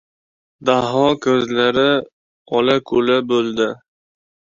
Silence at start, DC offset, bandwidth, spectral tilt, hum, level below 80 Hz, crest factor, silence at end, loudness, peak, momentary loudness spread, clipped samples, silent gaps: 0.6 s; under 0.1%; 7.6 kHz; -5.5 dB/octave; none; -56 dBFS; 16 dB; 0.85 s; -17 LUFS; -2 dBFS; 7 LU; under 0.1%; 2.13-2.45 s